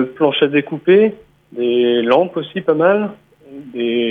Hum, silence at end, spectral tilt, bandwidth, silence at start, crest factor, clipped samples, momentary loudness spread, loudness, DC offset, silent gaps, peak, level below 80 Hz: none; 0 s; -8 dB/octave; 4.6 kHz; 0 s; 14 dB; under 0.1%; 10 LU; -16 LUFS; under 0.1%; none; -2 dBFS; -64 dBFS